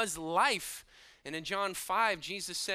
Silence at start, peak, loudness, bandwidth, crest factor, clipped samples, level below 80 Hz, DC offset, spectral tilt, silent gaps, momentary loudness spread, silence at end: 0 s; -14 dBFS; -32 LUFS; 15.5 kHz; 20 dB; under 0.1%; -66 dBFS; under 0.1%; -1.5 dB/octave; none; 13 LU; 0 s